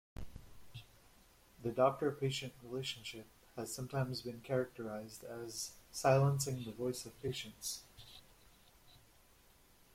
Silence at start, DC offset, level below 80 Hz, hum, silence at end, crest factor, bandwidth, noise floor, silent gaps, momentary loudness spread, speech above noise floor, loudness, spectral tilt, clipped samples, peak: 0.2 s; under 0.1%; -64 dBFS; none; 0.95 s; 24 dB; 16.5 kHz; -66 dBFS; none; 23 LU; 28 dB; -39 LUFS; -5 dB/octave; under 0.1%; -16 dBFS